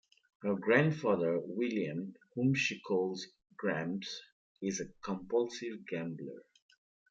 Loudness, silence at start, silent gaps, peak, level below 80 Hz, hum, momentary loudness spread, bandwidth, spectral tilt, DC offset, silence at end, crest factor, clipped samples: -35 LUFS; 0.4 s; 4.32-4.55 s; -12 dBFS; -76 dBFS; none; 15 LU; 7.8 kHz; -5.5 dB/octave; under 0.1%; 0.7 s; 22 dB; under 0.1%